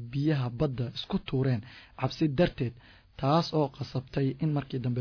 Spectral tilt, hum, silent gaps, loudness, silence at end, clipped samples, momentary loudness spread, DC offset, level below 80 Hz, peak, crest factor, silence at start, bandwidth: -8 dB/octave; none; none; -30 LUFS; 0 s; under 0.1%; 8 LU; under 0.1%; -52 dBFS; -14 dBFS; 16 dB; 0 s; 5.4 kHz